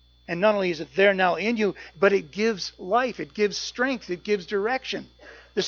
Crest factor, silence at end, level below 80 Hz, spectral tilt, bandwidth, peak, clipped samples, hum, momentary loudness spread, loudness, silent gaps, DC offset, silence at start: 20 dB; 0 s; -60 dBFS; -4.5 dB/octave; 7.2 kHz; -6 dBFS; under 0.1%; none; 10 LU; -25 LUFS; none; under 0.1%; 0.3 s